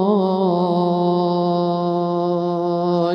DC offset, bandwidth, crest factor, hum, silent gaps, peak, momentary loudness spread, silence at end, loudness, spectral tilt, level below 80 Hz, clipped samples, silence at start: under 0.1%; 6 kHz; 12 dB; none; none; -6 dBFS; 3 LU; 0 s; -19 LUFS; -9.5 dB/octave; -68 dBFS; under 0.1%; 0 s